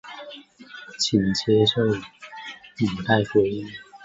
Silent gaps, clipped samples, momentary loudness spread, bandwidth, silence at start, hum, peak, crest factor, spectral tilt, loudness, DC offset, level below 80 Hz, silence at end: none; under 0.1%; 21 LU; 8 kHz; 0.05 s; none; -6 dBFS; 18 dB; -5 dB/octave; -22 LUFS; under 0.1%; -54 dBFS; 0 s